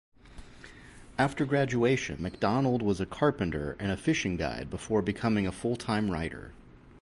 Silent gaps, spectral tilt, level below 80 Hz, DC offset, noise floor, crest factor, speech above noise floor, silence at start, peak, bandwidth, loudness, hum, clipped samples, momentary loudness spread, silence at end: none; -6 dB/octave; -50 dBFS; under 0.1%; -50 dBFS; 18 dB; 21 dB; 0.25 s; -12 dBFS; 11.5 kHz; -30 LUFS; none; under 0.1%; 14 LU; 0.1 s